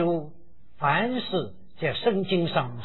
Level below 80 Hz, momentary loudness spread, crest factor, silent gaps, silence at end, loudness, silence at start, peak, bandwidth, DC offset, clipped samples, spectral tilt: -60 dBFS; 7 LU; 18 dB; none; 0 s; -26 LUFS; 0 s; -8 dBFS; 4.3 kHz; 1%; under 0.1%; -9 dB/octave